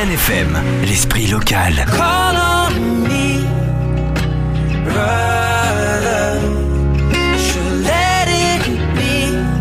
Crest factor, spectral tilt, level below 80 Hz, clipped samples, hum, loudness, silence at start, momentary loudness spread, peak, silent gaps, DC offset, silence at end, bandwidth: 12 dB; -4.5 dB/octave; -22 dBFS; under 0.1%; none; -15 LUFS; 0 s; 4 LU; -4 dBFS; none; under 0.1%; 0 s; 16 kHz